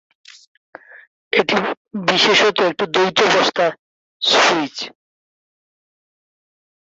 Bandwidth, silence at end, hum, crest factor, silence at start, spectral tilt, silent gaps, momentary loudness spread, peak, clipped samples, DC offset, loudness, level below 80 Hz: 8 kHz; 1.95 s; none; 18 dB; 0.95 s; -2.5 dB/octave; 1.07-1.31 s, 1.77-1.85 s, 3.79-4.20 s; 10 LU; -2 dBFS; under 0.1%; under 0.1%; -16 LUFS; -66 dBFS